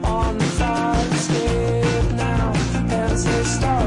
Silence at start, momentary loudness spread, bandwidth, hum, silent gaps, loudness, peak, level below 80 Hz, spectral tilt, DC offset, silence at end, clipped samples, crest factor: 0 s; 1 LU; 11 kHz; none; none; -20 LUFS; -10 dBFS; -26 dBFS; -5.5 dB/octave; under 0.1%; 0 s; under 0.1%; 10 dB